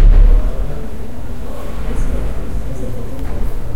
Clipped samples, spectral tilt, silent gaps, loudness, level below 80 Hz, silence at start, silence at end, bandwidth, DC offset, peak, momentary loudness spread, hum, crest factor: under 0.1%; -7.5 dB/octave; none; -22 LUFS; -14 dBFS; 0 s; 0 s; 6.8 kHz; 10%; 0 dBFS; 14 LU; none; 14 dB